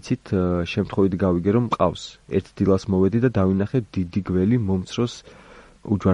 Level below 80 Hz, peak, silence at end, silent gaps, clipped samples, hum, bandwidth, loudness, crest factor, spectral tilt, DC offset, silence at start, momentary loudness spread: -48 dBFS; -4 dBFS; 0 s; none; under 0.1%; none; 9.8 kHz; -22 LUFS; 18 dB; -8 dB/octave; under 0.1%; 0.05 s; 7 LU